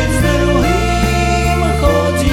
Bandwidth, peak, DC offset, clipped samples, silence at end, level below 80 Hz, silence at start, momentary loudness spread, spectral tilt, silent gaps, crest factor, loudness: 17.5 kHz; 0 dBFS; under 0.1%; under 0.1%; 0 s; -18 dBFS; 0 s; 1 LU; -5.5 dB/octave; none; 12 dB; -14 LUFS